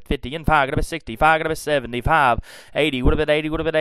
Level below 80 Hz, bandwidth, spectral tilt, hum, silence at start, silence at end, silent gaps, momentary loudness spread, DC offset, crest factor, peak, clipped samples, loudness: -30 dBFS; 14.5 kHz; -5.5 dB/octave; none; 0 s; 0 s; none; 9 LU; 0.4%; 18 dB; -2 dBFS; under 0.1%; -20 LUFS